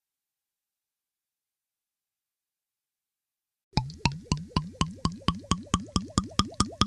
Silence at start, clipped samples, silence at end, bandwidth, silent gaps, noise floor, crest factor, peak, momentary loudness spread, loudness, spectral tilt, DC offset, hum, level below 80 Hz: 3.75 s; under 0.1%; 0 s; 12 kHz; none; under -90 dBFS; 28 dB; -4 dBFS; 5 LU; -30 LUFS; -4.5 dB/octave; under 0.1%; none; -44 dBFS